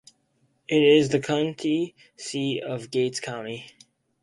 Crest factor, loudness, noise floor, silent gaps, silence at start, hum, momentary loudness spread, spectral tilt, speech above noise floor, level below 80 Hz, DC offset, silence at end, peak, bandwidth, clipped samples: 18 dB; -24 LUFS; -68 dBFS; none; 0.7 s; none; 18 LU; -5 dB/octave; 44 dB; -66 dBFS; under 0.1%; 0.55 s; -6 dBFS; 11.5 kHz; under 0.1%